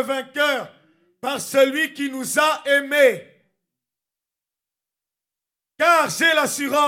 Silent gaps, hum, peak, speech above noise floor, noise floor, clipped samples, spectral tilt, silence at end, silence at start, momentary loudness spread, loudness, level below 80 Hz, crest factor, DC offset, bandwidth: none; none; -2 dBFS; 68 dB; -88 dBFS; under 0.1%; -2 dB/octave; 0 s; 0 s; 11 LU; -19 LUFS; -80 dBFS; 20 dB; under 0.1%; 17 kHz